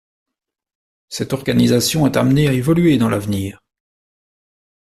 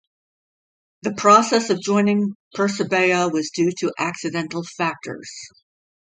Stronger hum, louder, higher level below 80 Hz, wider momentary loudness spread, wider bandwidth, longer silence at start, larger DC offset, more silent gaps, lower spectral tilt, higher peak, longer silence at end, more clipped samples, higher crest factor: neither; first, -16 LUFS vs -20 LUFS; first, -46 dBFS vs -68 dBFS; second, 11 LU vs 16 LU; first, 14 kHz vs 9.4 kHz; about the same, 1.1 s vs 1.05 s; neither; second, none vs 2.35-2.51 s; about the same, -5.5 dB/octave vs -4.5 dB/octave; about the same, -2 dBFS vs 0 dBFS; first, 1.4 s vs 0.55 s; neither; about the same, 16 dB vs 20 dB